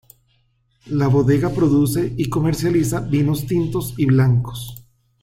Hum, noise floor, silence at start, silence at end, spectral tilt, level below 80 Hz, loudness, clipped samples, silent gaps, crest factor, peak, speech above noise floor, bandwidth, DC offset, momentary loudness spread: none; -62 dBFS; 0.85 s; 0.4 s; -7.5 dB/octave; -42 dBFS; -19 LUFS; under 0.1%; none; 14 dB; -6 dBFS; 45 dB; 16.5 kHz; under 0.1%; 8 LU